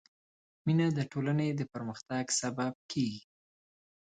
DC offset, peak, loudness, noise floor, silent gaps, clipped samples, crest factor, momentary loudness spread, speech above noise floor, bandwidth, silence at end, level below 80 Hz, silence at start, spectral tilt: under 0.1%; -18 dBFS; -33 LUFS; under -90 dBFS; 2.75-2.89 s; under 0.1%; 16 dB; 9 LU; over 58 dB; 9.4 kHz; 0.9 s; -70 dBFS; 0.65 s; -5 dB/octave